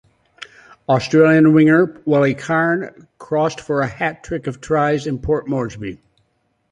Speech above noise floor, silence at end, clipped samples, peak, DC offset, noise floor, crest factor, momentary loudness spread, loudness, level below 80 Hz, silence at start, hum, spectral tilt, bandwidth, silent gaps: 49 dB; 0.75 s; under 0.1%; -2 dBFS; under 0.1%; -66 dBFS; 16 dB; 21 LU; -17 LUFS; -46 dBFS; 0.4 s; none; -7 dB/octave; 9.4 kHz; none